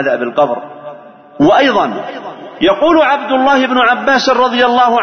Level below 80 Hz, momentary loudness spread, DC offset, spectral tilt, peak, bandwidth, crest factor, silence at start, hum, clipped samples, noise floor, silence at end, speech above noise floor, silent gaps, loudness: -48 dBFS; 17 LU; under 0.1%; -4.5 dB/octave; 0 dBFS; 6.6 kHz; 12 dB; 0 s; none; under 0.1%; -32 dBFS; 0 s; 21 dB; none; -11 LUFS